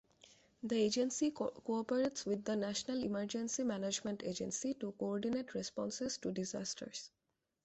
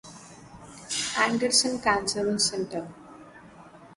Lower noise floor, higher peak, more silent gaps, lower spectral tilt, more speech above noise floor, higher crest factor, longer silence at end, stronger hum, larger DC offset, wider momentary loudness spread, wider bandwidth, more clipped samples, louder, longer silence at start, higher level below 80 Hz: first, -66 dBFS vs -49 dBFS; second, -24 dBFS vs -8 dBFS; neither; first, -4 dB/octave vs -2 dB/octave; first, 28 dB vs 23 dB; second, 16 dB vs 22 dB; first, 0.55 s vs 0 s; neither; neither; second, 7 LU vs 23 LU; second, 8.2 kHz vs 11.5 kHz; neither; second, -39 LUFS vs -25 LUFS; first, 0.65 s vs 0.05 s; second, -74 dBFS vs -58 dBFS